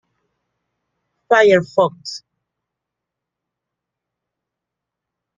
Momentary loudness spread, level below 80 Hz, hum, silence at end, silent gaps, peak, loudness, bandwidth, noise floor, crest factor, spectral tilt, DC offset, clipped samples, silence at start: 19 LU; -66 dBFS; none; 3.2 s; none; -2 dBFS; -15 LUFS; 9.2 kHz; -83 dBFS; 20 dB; -5 dB/octave; under 0.1%; under 0.1%; 1.3 s